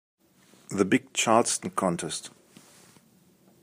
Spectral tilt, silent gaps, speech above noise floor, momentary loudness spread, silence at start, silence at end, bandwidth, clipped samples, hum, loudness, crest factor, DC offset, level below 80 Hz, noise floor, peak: -3.5 dB/octave; none; 35 dB; 13 LU; 0.7 s; 1.35 s; 15.5 kHz; under 0.1%; none; -26 LUFS; 22 dB; under 0.1%; -74 dBFS; -61 dBFS; -6 dBFS